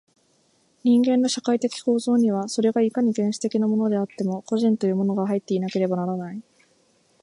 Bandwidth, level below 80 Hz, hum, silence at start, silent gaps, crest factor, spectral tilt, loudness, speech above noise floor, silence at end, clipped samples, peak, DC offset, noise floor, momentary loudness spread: 11.5 kHz; -74 dBFS; none; 0.85 s; none; 14 dB; -6 dB/octave; -23 LUFS; 42 dB; 0.8 s; under 0.1%; -10 dBFS; under 0.1%; -63 dBFS; 7 LU